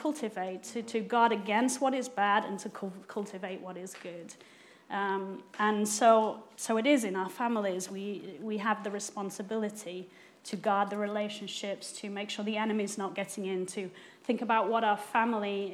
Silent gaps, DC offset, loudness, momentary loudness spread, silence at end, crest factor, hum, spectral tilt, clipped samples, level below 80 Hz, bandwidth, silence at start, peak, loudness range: none; under 0.1%; -32 LUFS; 15 LU; 0 s; 22 dB; none; -4 dB/octave; under 0.1%; under -90 dBFS; 16 kHz; 0 s; -10 dBFS; 6 LU